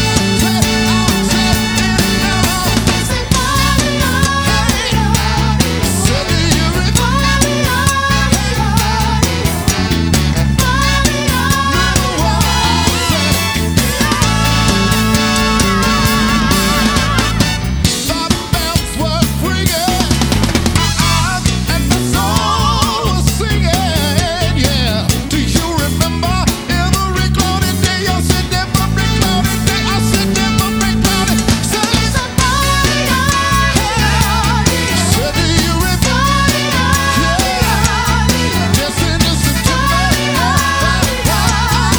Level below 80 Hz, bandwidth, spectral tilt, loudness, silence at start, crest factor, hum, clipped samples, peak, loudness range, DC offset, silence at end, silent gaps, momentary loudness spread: -20 dBFS; over 20 kHz; -4 dB/octave; -13 LUFS; 0 s; 12 dB; none; under 0.1%; 0 dBFS; 2 LU; under 0.1%; 0 s; none; 3 LU